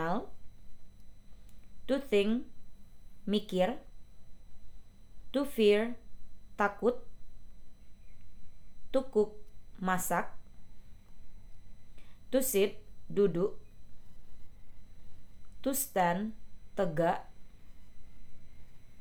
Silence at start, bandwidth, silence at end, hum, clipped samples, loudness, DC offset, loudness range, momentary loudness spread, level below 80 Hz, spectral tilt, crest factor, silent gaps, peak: 0 s; over 20 kHz; 0 s; none; under 0.1%; -32 LUFS; under 0.1%; 4 LU; 16 LU; -54 dBFS; -4.5 dB/octave; 20 dB; none; -14 dBFS